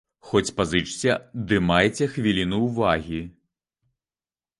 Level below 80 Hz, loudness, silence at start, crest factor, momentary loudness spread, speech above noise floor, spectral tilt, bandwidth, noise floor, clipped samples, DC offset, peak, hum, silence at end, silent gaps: -46 dBFS; -23 LUFS; 0.25 s; 22 dB; 7 LU; over 67 dB; -5 dB/octave; 11.5 kHz; under -90 dBFS; under 0.1%; under 0.1%; -2 dBFS; none; 1.3 s; none